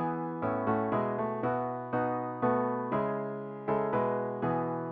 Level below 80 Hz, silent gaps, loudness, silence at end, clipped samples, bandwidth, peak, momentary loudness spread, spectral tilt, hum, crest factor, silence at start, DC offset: -68 dBFS; none; -32 LUFS; 0 s; under 0.1%; 4.6 kHz; -16 dBFS; 4 LU; -7.5 dB/octave; none; 16 dB; 0 s; under 0.1%